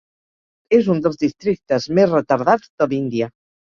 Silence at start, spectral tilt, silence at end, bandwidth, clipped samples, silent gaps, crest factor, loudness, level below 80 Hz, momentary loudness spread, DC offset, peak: 0.7 s; -7 dB/octave; 0.45 s; 7.2 kHz; under 0.1%; 2.70-2.78 s; 18 dB; -18 LUFS; -58 dBFS; 7 LU; under 0.1%; -2 dBFS